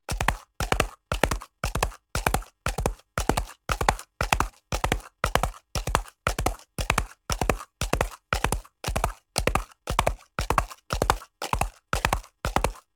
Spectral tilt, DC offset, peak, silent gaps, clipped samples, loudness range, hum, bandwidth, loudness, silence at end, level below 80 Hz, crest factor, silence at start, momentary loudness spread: -3.5 dB/octave; under 0.1%; -2 dBFS; none; under 0.1%; 1 LU; none; 18 kHz; -28 LUFS; 0.15 s; -34 dBFS; 26 dB; 0.1 s; 5 LU